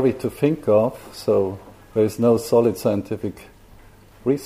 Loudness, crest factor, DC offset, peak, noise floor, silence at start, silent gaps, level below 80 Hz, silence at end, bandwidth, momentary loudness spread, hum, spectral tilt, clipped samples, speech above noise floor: -21 LUFS; 16 dB; under 0.1%; -4 dBFS; -47 dBFS; 0 s; none; -52 dBFS; 0 s; 15.5 kHz; 11 LU; 50 Hz at -50 dBFS; -7 dB/octave; under 0.1%; 27 dB